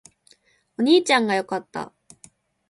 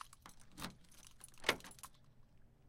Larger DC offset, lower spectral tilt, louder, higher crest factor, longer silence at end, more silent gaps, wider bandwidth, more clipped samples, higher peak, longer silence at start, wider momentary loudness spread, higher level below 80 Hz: neither; first, -3.5 dB/octave vs -2 dB/octave; first, -20 LUFS vs -43 LUFS; second, 20 dB vs 34 dB; first, 0.85 s vs 0 s; neither; second, 11.5 kHz vs 16.5 kHz; neither; first, -4 dBFS vs -16 dBFS; first, 0.8 s vs 0 s; about the same, 20 LU vs 22 LU; about the same, -70 dBFS vs -66 dBFS